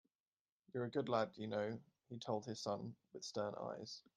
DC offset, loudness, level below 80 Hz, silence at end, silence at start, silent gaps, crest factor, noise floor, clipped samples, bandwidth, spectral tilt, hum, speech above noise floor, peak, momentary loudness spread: under 0.1%; -45 LUFS; -84 dBFS; 0.15 s; 0.75 s; none; 22 dB; under -90 dBFS; under 0.1%; 10 kHz; -5.5 dB/octave; none; over 46 dB; -24 dBFS; 12 LU